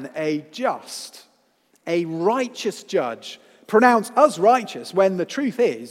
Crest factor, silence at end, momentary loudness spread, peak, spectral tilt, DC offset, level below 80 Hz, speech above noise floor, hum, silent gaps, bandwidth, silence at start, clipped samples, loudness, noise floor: 20 dB; 0 s; 18 LU; 0 dBFS; -5 dB/octave; under 0.1%; -80 dBFS; 42 dB; none; none; 16 kHz; 0 s; under 0.1%; -21 LUFS; -63 dBFS